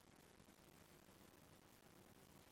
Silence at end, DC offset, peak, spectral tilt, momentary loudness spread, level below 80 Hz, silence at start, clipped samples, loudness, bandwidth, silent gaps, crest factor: 0 s; under 0.1%; -54 dBFS; -4 dB/octave; 1 LU; -82 dBFS; 0 s; under 0.1%; -67 LUFS; 16.5 kHz; none; 14 dB